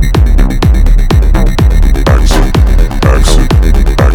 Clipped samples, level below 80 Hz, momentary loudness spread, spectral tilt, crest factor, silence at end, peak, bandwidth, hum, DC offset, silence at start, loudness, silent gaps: 0.8%; -6 dBFS; 2 LU; -6 dB/octave; 6 dB; 0 s; 0 dBFS; 15 kHz; none; 2%; 0 s; -9 LUFS; none